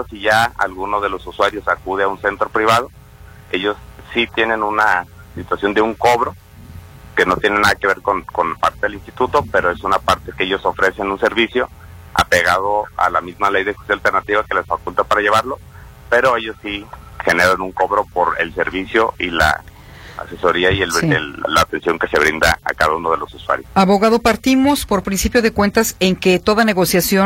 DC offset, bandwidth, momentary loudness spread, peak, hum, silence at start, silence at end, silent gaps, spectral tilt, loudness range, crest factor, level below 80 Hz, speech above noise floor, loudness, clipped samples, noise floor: under 0.1%; 16.5 kHz; 8 LU; 0 dBFS; none; 0 s; 0 s; none; -4 dB/octave; 3 LU; 16 dB; -38 dBFS; 24 dB; -16 LUFS; under 0.1%; -40 dBFS